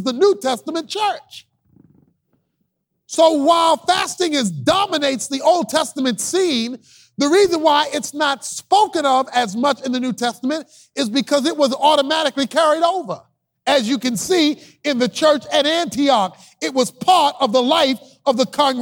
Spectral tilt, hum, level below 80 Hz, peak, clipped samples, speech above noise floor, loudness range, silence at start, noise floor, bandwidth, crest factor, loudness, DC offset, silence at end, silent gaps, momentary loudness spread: -3 dB/octave; none; -62 dBFS; -2 dBFS; under 0.1%; 54 dB; 2 LU; 0 s; -71 dBFS; over 20 kHz; 16 dB; -17 LUFS; under 0.1%; 0 s; none; 10 LU